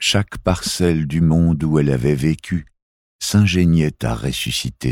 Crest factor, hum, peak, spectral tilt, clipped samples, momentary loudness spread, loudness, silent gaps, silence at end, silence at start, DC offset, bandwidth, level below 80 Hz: 14 dB; none; -2 dBFS; -5.5 dB/octave; under 0.1%; 7 LU; -18 LUFS; 2.82-3.19 s; 0 s; 0 s; under 0.1%; 16.5 kHz; -34 dBFS